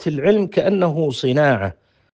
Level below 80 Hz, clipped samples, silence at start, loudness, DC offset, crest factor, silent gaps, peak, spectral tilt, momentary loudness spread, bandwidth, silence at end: -56 dBFS; under 0.1%; 0 s; -18 LUFS; under 0.1%; 16 dB; none; -2 dBFS; -7 dB/octave; 5 LU; 9 kHz; 0.4 s